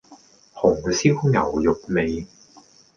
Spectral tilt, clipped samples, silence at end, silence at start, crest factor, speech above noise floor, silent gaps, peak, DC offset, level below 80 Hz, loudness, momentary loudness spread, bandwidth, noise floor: -6 dB/octave; under 0.1%; 0.7 s; 0.1 s; 18 dB; 32 dB; none; -4 dBFS; under 0.1%; -46 dBFS; -21 LUFS; 8 LU; 7.2 kHz; -52 dBFS